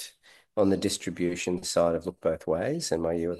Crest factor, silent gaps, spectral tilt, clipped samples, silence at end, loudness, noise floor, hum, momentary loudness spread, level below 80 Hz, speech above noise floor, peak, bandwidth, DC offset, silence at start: 18 dB; none; -4.5 dB/octave; under 0.1%; 0 s; -28 LUFS; -57 dBFS; none; 5 LU; -56 dBFS; 29 dB; -10 dBFS; 12.5 kHz; under 0.1%; 0 s